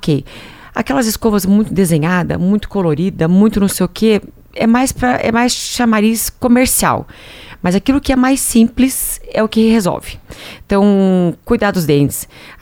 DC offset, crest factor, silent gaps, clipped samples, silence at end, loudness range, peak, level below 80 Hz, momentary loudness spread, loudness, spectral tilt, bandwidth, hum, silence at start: under 0.1%; 14 dB; none; under 0.1%; 0.1 s; 1 LU; 0 dBFS; -34 dBFS; 13 LU; -13 LUFS; -5 dB/octave; 18 kHz; none; 0 s